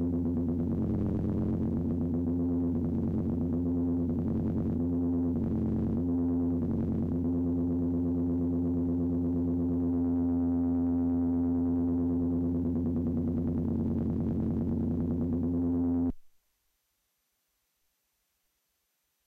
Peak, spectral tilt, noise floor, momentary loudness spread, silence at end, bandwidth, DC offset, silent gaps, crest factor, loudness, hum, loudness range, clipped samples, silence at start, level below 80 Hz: -22 dBFS; -12.5 dB/octave; -78 dBFS; 2 LU; 3 s; 2.2 kHz; under 0.1%; none; 8 dB; -30 LUFS; none; 4 LU; under 0.1%; 0 s; -46 dBFS